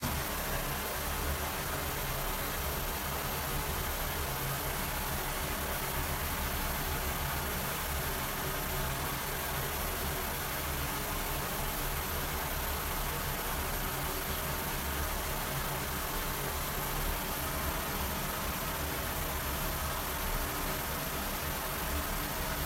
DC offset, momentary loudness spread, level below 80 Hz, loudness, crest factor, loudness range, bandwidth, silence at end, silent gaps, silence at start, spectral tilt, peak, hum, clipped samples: under 0.1%; 1 LU; -40 dBFS; -34 LUFS; 14 dB; 0 LU; 16 kHz; 0 s; none; 0 s; -3 dB/octave; -20 dBFS; none; under 0.1%